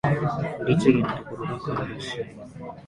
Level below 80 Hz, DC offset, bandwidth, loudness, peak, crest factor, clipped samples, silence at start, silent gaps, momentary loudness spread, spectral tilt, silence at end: -52 dBFS; under 0.1%; 11.5 kHz; -25 LUFS; -4 dBFS; 22 dB; under 0.1%; 0.05 s; none; 16 LU; -7.5 dB/octave; 0 s